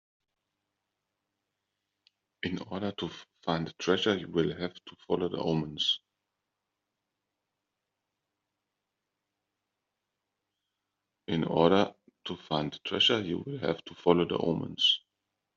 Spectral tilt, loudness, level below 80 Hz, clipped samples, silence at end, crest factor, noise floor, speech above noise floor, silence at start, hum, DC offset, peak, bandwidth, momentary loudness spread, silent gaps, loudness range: -3 dB/octave; -30 LUFS; -68 dBFS; under 0.1%; 0.55 s; 26 dB; -86 dBFS; 56 dB; 2.45 s; none; under 0.1%; -8 dBFS; 7.4 kHz; 14 LU; none; 10 LU